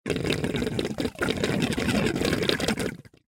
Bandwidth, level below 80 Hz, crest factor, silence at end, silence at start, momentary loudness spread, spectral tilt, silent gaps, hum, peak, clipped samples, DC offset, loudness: 17 kHz; -46 dBFS; 22 dB; 0.3 s; 0.05 s; 5 LU; -5 dB/octave; none; none; -4 dBFS; under 0.1%; under 0.1%; -26 LUFS